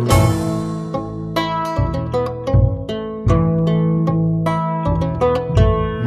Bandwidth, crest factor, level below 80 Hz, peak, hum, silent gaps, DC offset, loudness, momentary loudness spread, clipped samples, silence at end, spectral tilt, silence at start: 13.5 kHz; 16 dB; -28 dBFS; 0 dBFS; none; none; under 0.1%; -18 LUFS; 8 LU; under 0.1%; 0 s; -7.5 dB/octave; 0 s